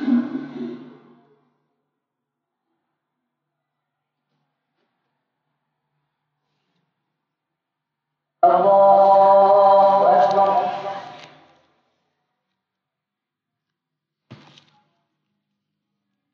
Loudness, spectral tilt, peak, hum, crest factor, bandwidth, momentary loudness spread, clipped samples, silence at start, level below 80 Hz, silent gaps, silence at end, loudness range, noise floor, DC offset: -15 LUFS; -7.5 dB/octave; -4 dBFS; none; 18 dB; 6.6 kHz; 19 LU; under 0.1%; 0 s; -78 dBFS; none; 5.2 s; 15 LU; -84 dBFS; under 0.1%